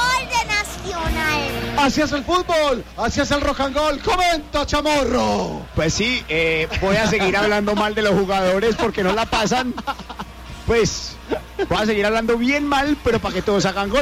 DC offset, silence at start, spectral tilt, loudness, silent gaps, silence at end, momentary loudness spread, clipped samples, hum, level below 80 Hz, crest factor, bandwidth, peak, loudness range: under 0.1%; 0 s; -4 dB/octave; -19 LUFS; none; 0 s; 8 LU; under 0.1%; none; -34 dBFS; 14 dB; 16 kHz; -6 dBFS; 3 LU